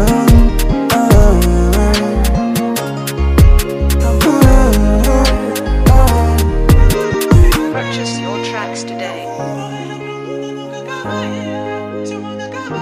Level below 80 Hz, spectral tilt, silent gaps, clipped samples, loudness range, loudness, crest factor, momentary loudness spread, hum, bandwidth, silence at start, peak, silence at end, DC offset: -14 dBFS; -6 dB/octave; none; 0.2%; 11 LU; -14 LUFS; 12 dB; 14 LU; none; 16 kHz; 0 s; 0 dBFS; 0 s; under 0.1%